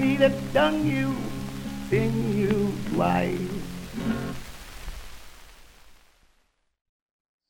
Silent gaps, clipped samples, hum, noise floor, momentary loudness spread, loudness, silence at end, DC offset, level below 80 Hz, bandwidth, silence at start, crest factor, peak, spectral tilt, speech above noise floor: none; under 0.1%; none; -68 dBFS; 19 LU; -26 LUFS; 1.55 s; under 0.1%; -44 dBFS; 17.5 kHz; 0 s; 18 dB; -10 dBFS; -6.5 dB/octave; 44 dB